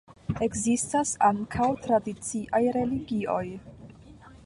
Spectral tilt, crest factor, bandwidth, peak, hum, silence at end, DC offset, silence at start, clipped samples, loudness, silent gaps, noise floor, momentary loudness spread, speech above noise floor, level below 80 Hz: -5 dB/octave; 18 dB; 11.5 kHz; -10 dBFS; none; 0.1 s; under 0.1%; 0.1 s; under 0.1%; -27 LUFS; none; -50 dBFS; 9 LU; 23 dB; -52 dBFS